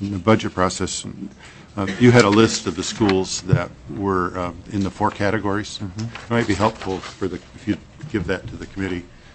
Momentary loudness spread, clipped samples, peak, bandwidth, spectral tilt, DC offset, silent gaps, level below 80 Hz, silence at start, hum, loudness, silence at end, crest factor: 14 LU; under 0.1%; 0 dBFS; 8.6 kHz; -5.5 dB/octave; under 0.1%; none; -44 dBFS; 0 s; none; -21 LUFS; 0.15 s; 20 dB